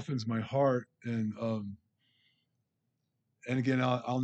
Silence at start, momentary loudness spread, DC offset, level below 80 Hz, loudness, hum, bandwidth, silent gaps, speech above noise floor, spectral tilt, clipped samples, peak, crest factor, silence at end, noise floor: 0 s; 9 LU; under 0.1%; -78 dBFS; -33 LUFS; none; 8.2 kHz; none; 50 dB; -7.5 dB/octave; under 0.1%; -18 dBFS; 18 dB; 0 s; -82 dBFS